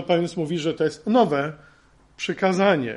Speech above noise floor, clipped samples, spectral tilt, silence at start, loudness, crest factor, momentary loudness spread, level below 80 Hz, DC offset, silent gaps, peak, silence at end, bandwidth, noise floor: 32 dB; under 0.1%; -6 dB/octave; 0 s; -23 LUFS; 16 dB; 10 LU; -60 dBFS; under 0.1%; none; -6 dBFS; 0 s; 11.5 kHz; -54 dBFS